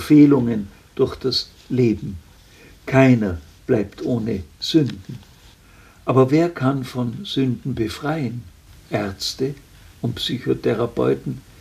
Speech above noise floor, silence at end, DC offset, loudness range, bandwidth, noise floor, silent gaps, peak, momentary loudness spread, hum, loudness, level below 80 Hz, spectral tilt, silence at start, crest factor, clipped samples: 29 dB; 0.2 s; under 0.1%; 5 LU; 15 kHz; -48 dBFS; none; 0 dBFS; 16 LU; none; -21 LUFS; -48 dBFS; -6.5 dB/octave; 0 s; 20 dB; under 0.1%